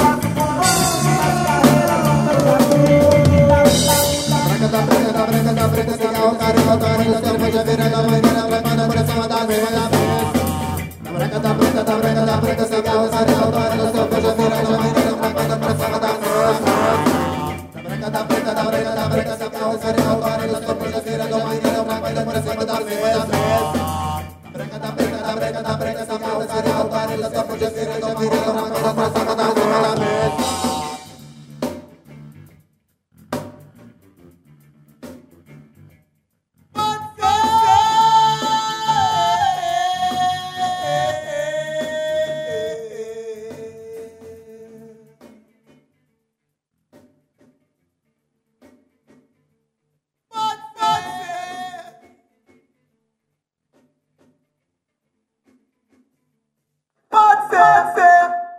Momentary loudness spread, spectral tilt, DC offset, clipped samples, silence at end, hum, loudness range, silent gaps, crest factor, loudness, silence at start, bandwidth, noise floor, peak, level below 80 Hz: 15 LU; -5 dB/octave; under 0.1%; under 0.1%; 0 s; none; 17 LU; none; 18 dB; -17 LUFS; 0 s; 16 kHz; -77 dBFS; 0 dBFS; -44 dBFS